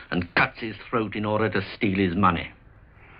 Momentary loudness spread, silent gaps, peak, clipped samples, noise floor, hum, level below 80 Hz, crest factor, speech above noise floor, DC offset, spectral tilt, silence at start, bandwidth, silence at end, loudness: 9 LU; none; -6 dBFS; under 0.1%; -51 dBFS; none; -50 dBFS; 20 dB; 26 dB; under 0.1%; -10 dB/octave; 0 s; 5.4 kHz; 0 s; -25 LUFS